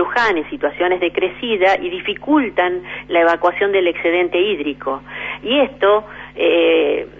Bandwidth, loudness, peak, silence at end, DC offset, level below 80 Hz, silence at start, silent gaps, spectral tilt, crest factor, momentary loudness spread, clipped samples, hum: 7.6 kHz; -17 LUFS; -4 dBFS; 0 s; under 0.1%; -50 dBFS; 0 s; none; -5.5 dB/octave; 14 dB; 9 LU; under 0.1%; none